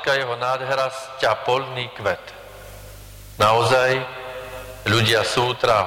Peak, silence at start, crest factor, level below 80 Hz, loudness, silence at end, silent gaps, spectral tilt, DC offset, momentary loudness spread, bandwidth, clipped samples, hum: -6 dBFS; 0 s; 14 dB; -48 dBFS; -20 LUFS; 0 s; none; -4 dB/octave; under 0.1%; 23 LU; 17 kHz; under 0.1%; none